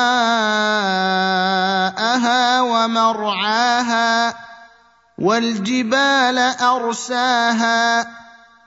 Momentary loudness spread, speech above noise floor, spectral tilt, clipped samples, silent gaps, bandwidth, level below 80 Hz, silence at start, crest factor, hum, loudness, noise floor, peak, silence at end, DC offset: 5 LU; 35 dB; -3 dB/octave; under 0.1%; none; 8 kHz; -68 dBFS; 0 s; 16 dB; none; -17 LUFS; -52 dBFS; -2 dBFS; 0.45 s; under 0.1%